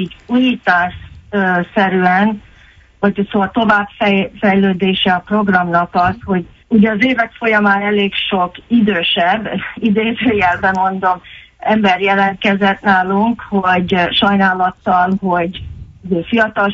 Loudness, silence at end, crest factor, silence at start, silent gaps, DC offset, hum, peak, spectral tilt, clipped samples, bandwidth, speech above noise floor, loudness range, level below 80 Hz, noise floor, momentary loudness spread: -14 LUFS; 0 s; 14 dB; 0 s; none; under 0.1%; none; 0 dBFS; -7 dB/octave; under 0.1%; 7 kHz; 31 dB; 2 LU; -44 dBFS; -45 dBFS; 6 LU